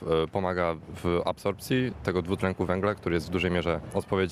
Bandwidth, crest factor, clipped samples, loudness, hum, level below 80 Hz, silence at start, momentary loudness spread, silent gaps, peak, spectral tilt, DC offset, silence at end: 14.5 kHz; 18 dB; under 0.1%; -29 LUFS; none; -48 dBFS; 0 s; 3 LU; none; -10 dBFS; -6.5 dB/octave; under 0.1%; 0 s